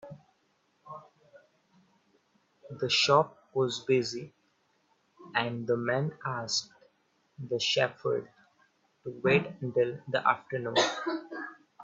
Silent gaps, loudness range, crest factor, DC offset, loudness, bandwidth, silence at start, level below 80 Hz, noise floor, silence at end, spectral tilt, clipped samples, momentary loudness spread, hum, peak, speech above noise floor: none; 4 LU; 22 dB; under 0.1%; -29 LUFS; 8 kHz; 0.05 s; -74 dBFS; -72 dBFS; 0 s; -4 dB/octave; under 0.1%; 21 LU; none; -10 dBFS; 43 dB